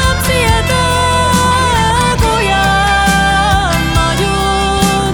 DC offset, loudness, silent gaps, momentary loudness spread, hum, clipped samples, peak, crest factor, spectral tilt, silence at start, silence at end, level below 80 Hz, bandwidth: under 0.1%; -11 LUFS; none; 2 LU; none; under 0.1%; 0 dBFS; 10 dB; -4 dB/octave; 0 s; 0 s; -20 dBFS; 20 kHz